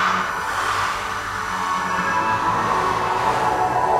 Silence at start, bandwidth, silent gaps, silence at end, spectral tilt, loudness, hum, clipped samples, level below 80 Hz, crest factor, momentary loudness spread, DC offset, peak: 0 s; 16 kHz; none; 0 s; -3.5 dB/octave; -21 LUFS; none; under 0.1%; -46 dBFS; 16 dB; 5 LU; under 0.1%; -6 dBFS